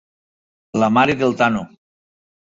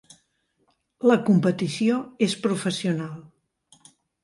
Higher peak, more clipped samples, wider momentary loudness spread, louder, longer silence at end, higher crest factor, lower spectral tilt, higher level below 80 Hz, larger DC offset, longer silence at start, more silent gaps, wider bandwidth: first, -2 dBFS vs -8 dBFS; neither; about the same, 11 LU vs 10 LU; first, -17 LUFS vs -23 LUFS; second, 0.8 s vs 1 s; about the same, 18 dB vs 18 dB; about the same, -6 dB/octave vs -6 dB/octave; first, -54 dBFS vs -68 dBFS; neither; second, 0.75 s vs 1.05 s; neither; second, 7.8 kHz vs 11.5 kHz